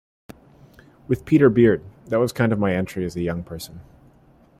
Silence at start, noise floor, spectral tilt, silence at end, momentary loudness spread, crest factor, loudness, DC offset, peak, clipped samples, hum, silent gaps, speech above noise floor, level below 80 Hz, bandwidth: 1.1 s; -54 dBFS; -7.5 dB/octave; 0.8 s; 16 LU; 20 dB; -21 LUFS; under 0.1%; -4 dBFS; under 0.1%; none; none; 34 dB; -50 dBFS; 15.5 kHz